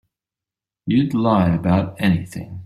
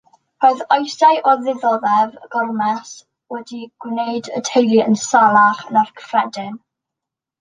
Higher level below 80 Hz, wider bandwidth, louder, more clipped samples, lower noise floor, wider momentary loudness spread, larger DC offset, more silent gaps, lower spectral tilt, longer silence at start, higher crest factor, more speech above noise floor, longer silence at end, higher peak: first, -48 dBFS vs -70 dBFS; first, 13 kHz vs 9.8 kHz; second, -19 LUFS vs -16 LUFS; neither; first, -88 dBFS vs -84 dBFS; second, 9 LU vs 18 LU; neither; neither; first, -8 dB/octave vs -4 dB/octave; first, 0.85 s vs 0.4 s; about the same, 16 dB vs 16 dB; about the same, 70 dB vs 68 dB; second, 0 s vs 0.85 s; about the same, -4 dBFS vs -2 dBFS